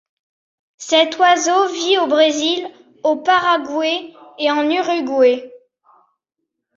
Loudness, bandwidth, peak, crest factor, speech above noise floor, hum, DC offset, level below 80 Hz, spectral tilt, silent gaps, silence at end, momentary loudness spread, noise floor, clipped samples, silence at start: -16 LUFS; 7.8 kHz; -2 dBFS; 16 dB; 62 dB; none; under 0.1%; -68 dBFS; -1 dB/octave; none; 1.2 s; 9 LU; -78 dBFS; under 0.1%; 0.8 s